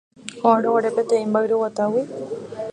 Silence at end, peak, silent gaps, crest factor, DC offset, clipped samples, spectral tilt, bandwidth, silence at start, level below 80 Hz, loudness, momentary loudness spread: 0 s; -2 dBFS; none; 18 dB; under 0.1%; under 0.1%; -6 dB/octave; 10 kHz; 0.25 s; -70 dBFS; -21 LUFS; 13 LU